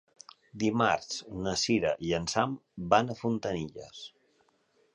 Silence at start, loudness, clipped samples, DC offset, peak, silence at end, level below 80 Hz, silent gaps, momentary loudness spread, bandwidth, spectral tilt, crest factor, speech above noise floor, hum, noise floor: 0.55 s; -30 LUFS; under 0.1%; under 0.1%; -10 dBFS; 0.85 s; -58 dBFS; none; 18 LU; 11 kHz; -4.5 dB/octave; 22 dB; 40 dB; none; -70 dBFS